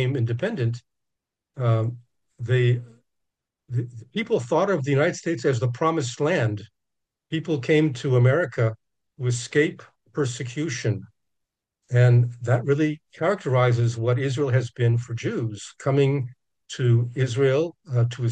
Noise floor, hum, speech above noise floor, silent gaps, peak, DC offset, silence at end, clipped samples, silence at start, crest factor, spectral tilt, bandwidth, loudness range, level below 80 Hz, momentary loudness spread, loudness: -83 dBFS; none; 61 dB; none; -6 dBFS; under 0.1%; 0 s; under 0.1%; 0 s; 16 dB; -7 dB/octave; 9 kHz; 4 LU; -64 dBFS; 10 LU; -24 LUFS